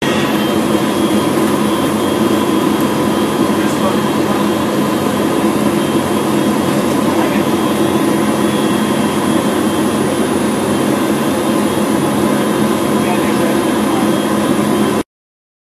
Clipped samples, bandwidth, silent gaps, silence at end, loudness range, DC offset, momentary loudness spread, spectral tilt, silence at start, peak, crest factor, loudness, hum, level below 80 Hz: under 0.1%; 14 kHz; none; 0.65 s; 0 LU; under 0.1%; 1 LU; -5 dB/octave; 0 s; 0 dBFS; 14 dB; -14 LUFS; none; -48 dBFS